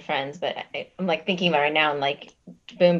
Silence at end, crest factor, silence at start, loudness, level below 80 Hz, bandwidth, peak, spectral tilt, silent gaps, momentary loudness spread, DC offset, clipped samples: 0 s; 20 dB; 0 s; -24 LUFS; -70 dBFS; 7.6 kHz; -6 dBFS; -6 dB/octave; none; 12 LU; under 0.1%; under 0.1%